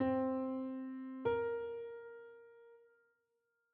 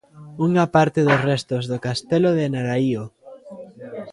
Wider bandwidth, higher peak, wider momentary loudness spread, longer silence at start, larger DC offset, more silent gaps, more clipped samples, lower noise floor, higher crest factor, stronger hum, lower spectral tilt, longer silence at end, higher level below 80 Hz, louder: second, 4.3 kHz vs 11.5 kHz; second, -24 dBFS vs -2 dBFS; about the same, 20 LU vs 22 LU; second, 0 s vs 0.15 s; neither; neither; neither; first, -84 dBFS vs -40 dBFS; about the same, 18 dB vs 20 dB; neither; about the same, -6 dB/octave vs -7 dB/octave; first, 0.95 s vs 0 s; second, -76 dBFS vs -58 dBFS; second, -40 LUFS vs -20 LUFS